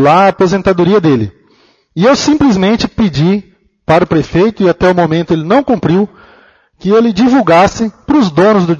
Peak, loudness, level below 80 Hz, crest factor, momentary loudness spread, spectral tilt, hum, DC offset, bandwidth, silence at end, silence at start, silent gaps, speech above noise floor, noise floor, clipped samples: 0 dBFS; -10 LUFS; -38 dBFS; 10 dB; 6 LU; -6.5 dB/octave; none; under 0.1%; 8 kHz; 0 s; 0 s; none; 40 dB; -50 dBFS; under 0.1%